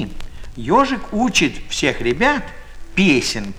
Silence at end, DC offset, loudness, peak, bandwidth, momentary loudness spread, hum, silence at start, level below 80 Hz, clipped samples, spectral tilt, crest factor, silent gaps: 0 s; under 0.1%; -17 LUFS; -2 dBFS; 15.5 kHz; 16 LU; none; 0 s; -34 dBFS; under 0.1%; -4 dB/octave; 18 dB; none